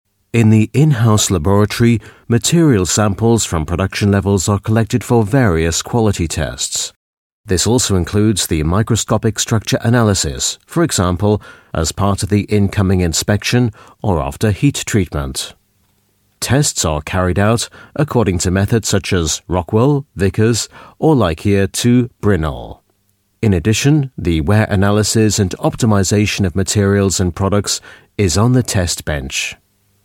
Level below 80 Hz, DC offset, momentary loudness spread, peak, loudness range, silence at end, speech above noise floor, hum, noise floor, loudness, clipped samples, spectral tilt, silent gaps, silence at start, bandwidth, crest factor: -34 dBFS; under 0.1%; 7 LU; 0 dBFS; 3 LU; 0.5 s; 47 dB; none; -61 dBFS; -15 LUFS; under 0.1%; -5 dB/octave; 6.96-7.44 s; 0.35 s; 16.5 kHz; 14 dB